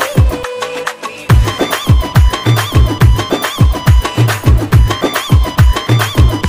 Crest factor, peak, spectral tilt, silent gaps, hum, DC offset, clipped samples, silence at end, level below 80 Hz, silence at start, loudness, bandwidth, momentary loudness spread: 10 dB; 0 dBFS; -5.5 dB/octave; none; none; 0.4%; under 0.1%; 0 s; -14 dBFS; 0 s; -12 LUFS; 16 kHz; 9 LU